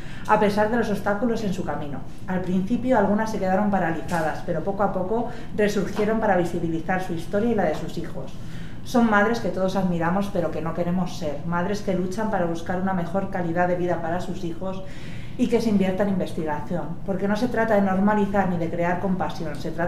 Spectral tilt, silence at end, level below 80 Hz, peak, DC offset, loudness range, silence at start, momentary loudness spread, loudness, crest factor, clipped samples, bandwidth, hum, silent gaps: -7 dB/octave; 0 s; -40 dBFS; -4 dBFS; 3%; 2 LU; 0 s; 10 LU; -24 LUFS; 20 dB; under 0.1%; 14 kHz; none; none